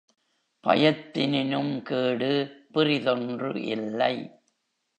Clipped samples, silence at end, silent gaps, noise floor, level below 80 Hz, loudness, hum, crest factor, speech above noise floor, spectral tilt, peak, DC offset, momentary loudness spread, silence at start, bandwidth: under 0.1%; 0.7 s; none; -75 dBFS; -74 dBFS; -26 LUFS; none; 22 dB; 49 dB; -7 dB/octave; -6 dBFS; under 0.1%; 9 LU; 0.65 s; 9 kHz